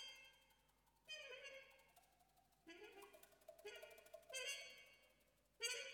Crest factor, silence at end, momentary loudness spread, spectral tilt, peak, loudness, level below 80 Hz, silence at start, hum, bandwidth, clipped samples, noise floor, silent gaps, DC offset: 26 dB; 0 s; 17 LU; 1 dB/octave; -30 dBFS; -54 LUFS; -88 dBFS; 0 s; none; 19 kHz; under 0.1%; -79 dBFS; none; under 0.1%